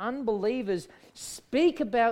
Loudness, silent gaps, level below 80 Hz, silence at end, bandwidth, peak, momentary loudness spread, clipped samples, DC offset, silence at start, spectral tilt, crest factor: -28 LUFS; none; -62 dBFS; 0 s; 16 kHz; -12 dBFS; 15 LU; under 0.1%; under 0.1%; 0 s; -4.5 dB/octave; 16 dB